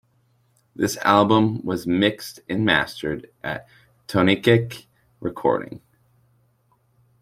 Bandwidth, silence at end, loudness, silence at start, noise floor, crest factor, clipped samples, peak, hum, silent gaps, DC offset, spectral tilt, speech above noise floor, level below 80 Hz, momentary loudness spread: 16 kHz; 1.45 s; -21 LUFS; 0.8 s; -64 dBFS; 22 dB; under 0.1%; -2 dBFS; none; none; under 0.1%; -5.5 dB/octave; 43 dB; -56 dBFS; 16 LU